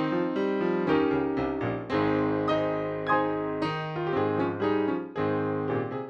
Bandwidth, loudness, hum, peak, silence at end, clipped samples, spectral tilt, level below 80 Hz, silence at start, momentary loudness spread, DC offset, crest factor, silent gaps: 6.8 kHz; -28 LUFS; none; -12 dBFS; 0 s; under 0.1%; -8.5 dB/octave; -56 dBFS; 0 s; 5 LU; under 0.1%; 16 dB; none